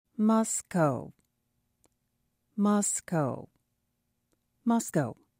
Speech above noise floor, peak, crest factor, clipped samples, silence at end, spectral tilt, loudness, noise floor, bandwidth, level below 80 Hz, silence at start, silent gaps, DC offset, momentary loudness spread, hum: 51 dB; -14 dBFS; 18 dB; under 0.1%; 0.25 s; -5.5 dB/octave; -29 LUFS; -79 dBFS; 16 kHz; -72 dBFS; 0.2 s; none; under 0.1%; 13 LU; 60 Hz at -60 dBFS